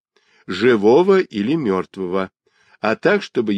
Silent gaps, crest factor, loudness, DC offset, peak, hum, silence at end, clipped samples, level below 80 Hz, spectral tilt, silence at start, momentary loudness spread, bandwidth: none; 16 dB; -18 LUFS; under 0.1%; -2 dBFS; none; 0 s; under 0.1%; -64 dBFS; -7 dB/octave; 0.5 s; 11 LU; 9.2 kHz